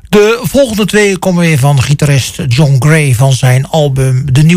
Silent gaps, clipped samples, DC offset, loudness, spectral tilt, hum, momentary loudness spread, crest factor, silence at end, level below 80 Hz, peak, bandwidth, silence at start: none; under 0.1%; under 0.1%; -9 LUFS; -6 dB/octave; none; 3 LU; 8 dB; 0 s; -34 dBFS; 0 dBFS; 16 kHz; 0.1 s